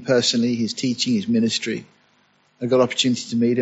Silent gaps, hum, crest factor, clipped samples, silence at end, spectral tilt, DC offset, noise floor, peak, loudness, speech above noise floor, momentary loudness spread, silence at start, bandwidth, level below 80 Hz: none; none; 16 dB; under 0.1%; 0 s; -4 dB/octave; under 0.1%; -61 dBFS; -4 dBFS; -21 LUFS; 41 dB; 8 LU; 0 s; 8 kHz; -64 dBFS